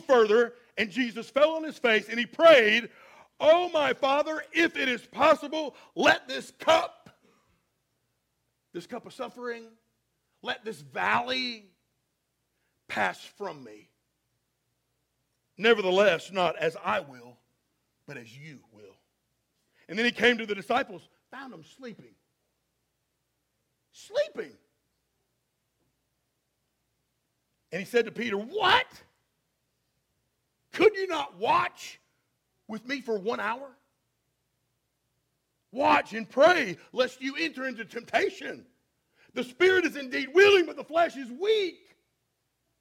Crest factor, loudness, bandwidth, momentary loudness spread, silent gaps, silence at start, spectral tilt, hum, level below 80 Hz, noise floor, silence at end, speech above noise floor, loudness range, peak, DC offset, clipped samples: 24 dB; -26 LUFS; 16 kHz; 20 LU; none; 0.1 s; -3.5 dB/octave; none; -72 dBFS; -78 dBFS; 1.1 s; 52 dB; 16 LU; -6 dBFS; under 0.1%; under 0.1%